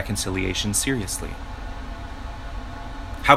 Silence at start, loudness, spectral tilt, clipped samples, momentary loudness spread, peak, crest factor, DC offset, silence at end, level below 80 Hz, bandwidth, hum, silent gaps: 0 s; -28 LUFS; -3.5 dB/octave; under 0.1%; 14 LU; 0 dBFS; 24 dB; under 0.1%; 0 s; -34 dBFS; 16 kHz; none; none